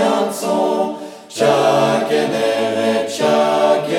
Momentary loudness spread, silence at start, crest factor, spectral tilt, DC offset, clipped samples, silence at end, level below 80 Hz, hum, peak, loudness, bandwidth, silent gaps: 6 LU; 0 s; 14 dB; -4.5 dB/octave; under 0.1%; under 0.1%; 0 s; -72 dBFS; none; -2 dBFS; -16 LUFS; 16.5 kHz; none